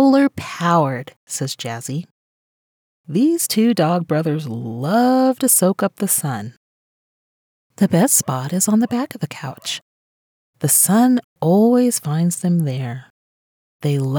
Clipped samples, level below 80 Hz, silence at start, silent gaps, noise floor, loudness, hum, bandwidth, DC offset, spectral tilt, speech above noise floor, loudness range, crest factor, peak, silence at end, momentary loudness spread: under 0.1%; -66 dBFS; 0 s; 1.16-1.27 s, 2.11-3.04 s, 6.57-7.70 s, 9.82-10.53 s, 11.24-11.36 s, 13.10-13.80 s; under -90 dBFS; -18 LUFS; none; over 20 kHz; under 0.1%; -5 dB/octave; over 73 dB; 4 LU; 16 dB; -4 dBFS; 0 s; 14 LU